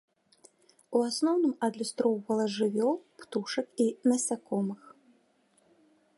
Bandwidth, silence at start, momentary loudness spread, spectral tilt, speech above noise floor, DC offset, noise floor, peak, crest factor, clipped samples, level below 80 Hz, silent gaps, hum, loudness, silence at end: 11.5 kHz; 0.9 s; 9 LU; -4.5 dB/octave; 39 dB; under 0.1%; -68 dBFS; -14 dBFS; 18 dB; under 0.1%; -82 dBFS; none; none; -30 LUFS; 1.3 s